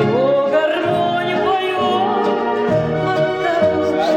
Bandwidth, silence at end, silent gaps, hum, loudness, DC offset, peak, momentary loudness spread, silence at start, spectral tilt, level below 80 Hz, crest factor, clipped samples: 13.5 kHz; 0 s; none; none; -17 LUFS; under 0.1%; -4 dBFS; 2 LU; 0 s; -6.5 dB/octave; -50 dBFS; 12 dB; under 0.1%